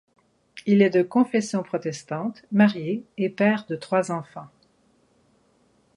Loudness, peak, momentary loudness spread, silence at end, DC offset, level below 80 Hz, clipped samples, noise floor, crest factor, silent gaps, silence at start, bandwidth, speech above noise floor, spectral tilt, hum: -23 LUFS; -4 dBFS; 11 LU; 1.5 s; under 0.1%; -70 dBFS; under 0.1%; -63 dBFS; 20 dB; none; 0.55 s; 11 kHz; 40 dB; -6.5 dB/octave; none